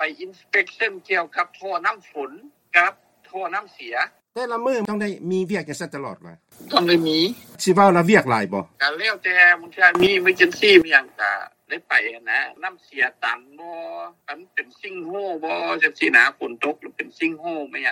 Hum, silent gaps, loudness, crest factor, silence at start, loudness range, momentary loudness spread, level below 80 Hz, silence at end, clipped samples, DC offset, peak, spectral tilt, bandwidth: none; none; -19 LUFS; 22 dB; 0 s; 10 LU; 18 LU; -66 dBFS; 0 s; under 0.1%; under 0.1%; 0 dBFS; -4.5 dB/octave; 17 kHz